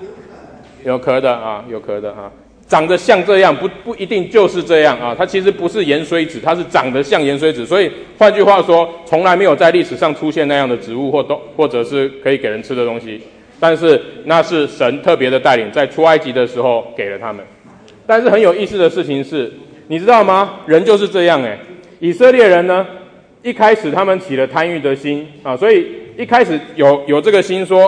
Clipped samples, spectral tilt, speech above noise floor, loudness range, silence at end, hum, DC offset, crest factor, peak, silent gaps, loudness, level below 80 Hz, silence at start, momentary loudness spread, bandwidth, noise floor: under 0.1%; -5.5 dB/octave; 29 dB; 4 LU; 0 s; none; under 0.1%; 14 dB; 0 dBFS; none; -13 LUFS; -54 dBFS; 0 s; 13 LU; 10 kHz; -41 dBFS